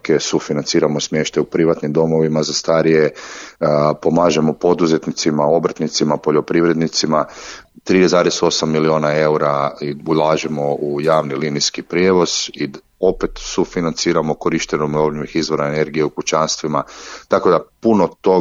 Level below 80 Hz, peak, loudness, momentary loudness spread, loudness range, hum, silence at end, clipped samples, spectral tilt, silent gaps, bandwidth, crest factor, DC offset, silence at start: -46 dBFS; -2 dBFS; -17 LUFS; 7 LU; 3 LU; none; 0 s; under 0.1%; -4.5 dB/octave; none; 7.8 kHz; 14 dB; under 0.1%; 0.05 s